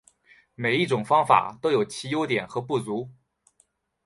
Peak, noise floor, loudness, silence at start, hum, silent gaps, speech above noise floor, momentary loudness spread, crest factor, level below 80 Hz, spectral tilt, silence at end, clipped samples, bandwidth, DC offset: -4 dBFS; -67 dBFS; -24 LUFS; 0.6 s; none; none; 43 dB; 10 LU; 22 dB; -68 dBFS; -5.5 dB/octave; 0.95 s; under 0.1%; 11.5 kHz; under 0.1%